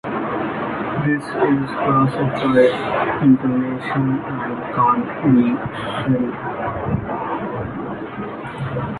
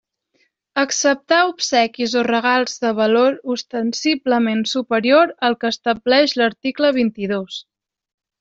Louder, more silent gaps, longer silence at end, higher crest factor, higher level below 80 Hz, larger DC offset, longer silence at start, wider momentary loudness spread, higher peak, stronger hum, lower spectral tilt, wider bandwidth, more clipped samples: about the same, -20 LUFS vs -18 LUFS; neither; second, 0 s vs 0.8 s; about the same, 16 dB vs 16 dB; first, -46 dBFS vs -62 dBFS; neither; second, 0.05 s vs 0.75 s; about the same, 11 LU vs 9 LU; about the same, -2 dBFS vs -2 dBFS; neither; first, -8.5 dB/octave vs -3 dB/octave; first, 11 kHz vs 8 kHz; neither